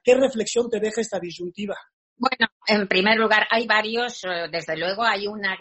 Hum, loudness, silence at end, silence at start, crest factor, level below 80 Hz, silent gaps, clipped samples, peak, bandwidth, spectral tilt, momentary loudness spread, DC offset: none; -22 LUFS; 0 s; 0.05 s; 20 dB; -64 dBFS; 1.93-2.16 s, 2.52-2.60 s; under 0.1%; -2 dBFS; 8.2 kHz; -3.5 dB/octave; 13 LU; under 0.1%